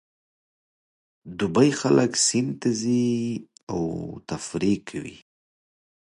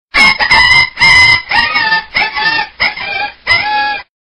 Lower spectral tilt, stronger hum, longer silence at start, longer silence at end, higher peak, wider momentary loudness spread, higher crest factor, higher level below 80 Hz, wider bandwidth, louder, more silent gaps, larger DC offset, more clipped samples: first, -4.5 dB/octave vs -1.5 dB/octave; neither; first, 1.25 s vs 0.15 s; first, 0.85 s vs 0.2 s; second, -6 dBFS vs 0 dBFS; first, 15 LU vs 10 LU; first, 20 dB vs 10 dB; second, -58 dBFS vs -36 dBFS; second, 11.5 kHz vs 13 kHz; second, -24 LUFS vs -8 LUFS; first, 3.63-3.67 s vs none; neither; neither